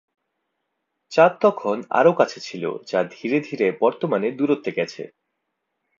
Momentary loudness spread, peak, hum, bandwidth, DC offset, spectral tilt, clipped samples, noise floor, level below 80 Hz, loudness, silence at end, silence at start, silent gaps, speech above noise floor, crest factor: 12 LU; -2 dBFS; none; 7.6 kHz; under 0.1%; -6 dB/octave; under 0.1%; -77 dBFS; -74 dBFS; -21 LUFS; 0.9 s; 1.1 s; none; 57 dB; 20 dB